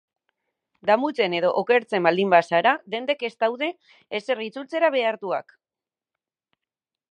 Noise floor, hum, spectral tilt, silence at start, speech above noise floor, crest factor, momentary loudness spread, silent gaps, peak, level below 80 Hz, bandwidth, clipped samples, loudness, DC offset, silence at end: under -90 dBFS; none; -5.5 dB/octave; 0.85 s; over 67 dB; 22 dB; 11 LU; none; -2 dBFS; -82 dBFS; 9.4 kHz; under 0.1%; -23 LUFS; under 0.1%; 1.7 s